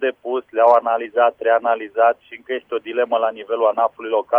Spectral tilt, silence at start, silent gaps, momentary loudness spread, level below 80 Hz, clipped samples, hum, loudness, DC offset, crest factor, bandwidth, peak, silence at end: -5.5 dB/octave; 0 s; none; 11 LU; -70 dBFS; under 0.1%; none; -19 LUFS; under 0.1%; 16 dB; 4.1 kHz; -2 dBFS; 0 s